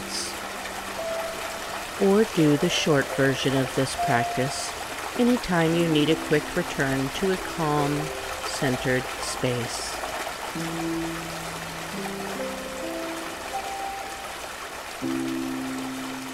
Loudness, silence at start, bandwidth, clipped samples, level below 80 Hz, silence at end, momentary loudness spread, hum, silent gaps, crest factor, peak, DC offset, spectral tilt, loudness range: -26 LUFS; 0 s; 16 kHz; under 0.1%; -50 dBFS; 0 s; 11 LU; none; none; 18 dB; -8 dBFS; under 0.1%; -4.5 dB/octave; 8 LU